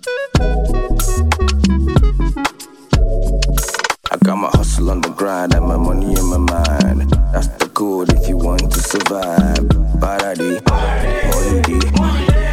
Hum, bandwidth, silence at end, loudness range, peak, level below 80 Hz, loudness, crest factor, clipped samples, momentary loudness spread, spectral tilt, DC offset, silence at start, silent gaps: none; 16.5 kHz; 0 s; 1 LU; 0 dBFS; -16 dBFS; -16 LUFS; 14 dB; under 0.1%; 4 LU; -5.5 dB/octave; under 0.1%; 0.05 s; none